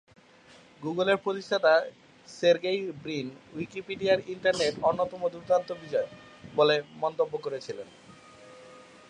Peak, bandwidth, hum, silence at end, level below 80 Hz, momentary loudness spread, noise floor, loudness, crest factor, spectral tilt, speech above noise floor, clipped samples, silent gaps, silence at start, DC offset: -10 dBFS; 10 kHz; none; 0.3 s; -68 dBFS; 15 LU; -55 dBFS; -28 LUFS; 20 dB; -4.5 dB/octave; 28 dB; under 0.1%; none; 0.8 s; under 0.1%